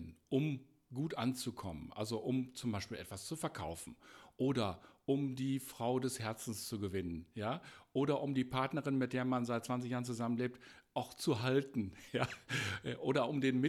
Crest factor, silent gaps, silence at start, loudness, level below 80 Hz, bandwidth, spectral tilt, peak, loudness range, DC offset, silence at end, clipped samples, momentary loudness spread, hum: 20 dB; none; 0 s; -39 LUFS; -68 dBFS; 14.5 kHz; -5.5 dB/octave; -18 dBFS; 3 LU; under 0.1%; 0 s; under 0.1%; 10 LU; none